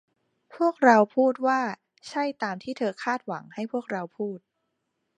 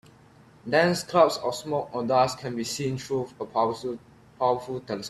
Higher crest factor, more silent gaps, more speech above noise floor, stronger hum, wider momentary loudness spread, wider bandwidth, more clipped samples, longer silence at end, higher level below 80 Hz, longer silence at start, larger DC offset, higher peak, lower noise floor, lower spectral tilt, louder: about the same, 22 dB vs 20 dB; neither; first, 53 dB vs 28 dB; neither; first, 16 LU vs 11 LU; second, 9.8 kHz vs 14.5 kHz; neither; first, 0.8 s vs 0 s; second, -80 dBFS vs -64 dBFS; about the same, 0.55 s vs 0.65 s; neither; about the same, -4 dBFS vs -6 dBFS; first, -78 dBFS vs -54 dBFS; about the same, -5.5 dB/octave vs -4.5 dB/octave; about the same, -26 LUFS vs -26 LUFS